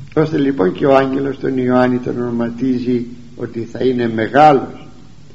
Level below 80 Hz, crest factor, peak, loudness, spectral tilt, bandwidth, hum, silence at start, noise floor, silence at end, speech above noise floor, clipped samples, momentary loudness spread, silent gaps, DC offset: -48 dBFS; 16 dB; 0 dBFS; -15 LUFS; -8 dB/octave; 7.8 kHz; none; 0 s; -40 dBFS; 0.5 s; 26 dB; 0.1%; 15 LU; none; 1%